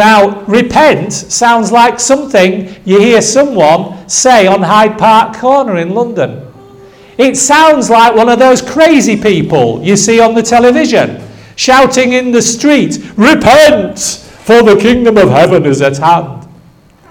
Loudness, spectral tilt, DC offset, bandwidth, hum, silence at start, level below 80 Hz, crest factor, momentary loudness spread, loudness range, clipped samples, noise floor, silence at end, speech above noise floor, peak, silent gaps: -7 LUFS; -4 dB/octave; 0.2%; 19 kHz; none; 0 s; -40 dBFS; 8 dB; 8 LU; 2 LU; 3%; -41 dBFS; 0.65 s; 34 dB; 0 dBFS; none